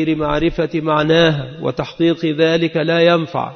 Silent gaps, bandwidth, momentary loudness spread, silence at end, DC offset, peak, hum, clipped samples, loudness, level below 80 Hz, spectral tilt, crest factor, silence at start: none; 6.6 kHz; 8 LU; 0 s; under 0.1%; 0 dBFS; none; under 0.1%; -16 LUFS; -38 dBFS; -7 dB/octave; 14 dB; 0 s